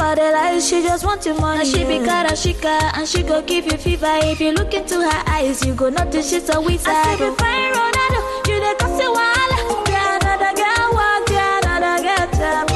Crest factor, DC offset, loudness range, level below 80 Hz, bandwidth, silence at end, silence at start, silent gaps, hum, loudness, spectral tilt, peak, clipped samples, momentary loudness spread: 12 dB; under 0.1%; 2 LU; -28 dBFS; 12.5 kHz; 0 s; 0 s; none; none; -17 LUFS; -4 dB/octave; -6 dBFS; under 0.1%; 4 LU